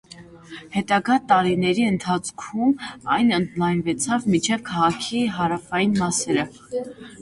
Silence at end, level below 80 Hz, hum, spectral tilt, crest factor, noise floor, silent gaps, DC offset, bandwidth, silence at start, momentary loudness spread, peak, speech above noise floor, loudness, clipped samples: 0 s; -56 dBFS; none; -4.5 dB/octave; 18 dB; -43 dBFS; none; under 0.1%; 11.5 kHz; 0.1 s; 10 LU; -4 dBFS; 21 dB; -22 LUFS; under 0.1%